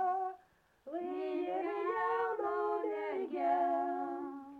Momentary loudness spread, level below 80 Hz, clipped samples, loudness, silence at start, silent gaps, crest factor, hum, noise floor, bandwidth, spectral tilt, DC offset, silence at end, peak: 10 LU; -80 dBFS; under 0.1%; -36 LUFS; 0 s; none; 14 dB; none; -68 dBFS; 5.4 kHz; -6 dB/octave; under 0.1%; 0 s; -22 dBFS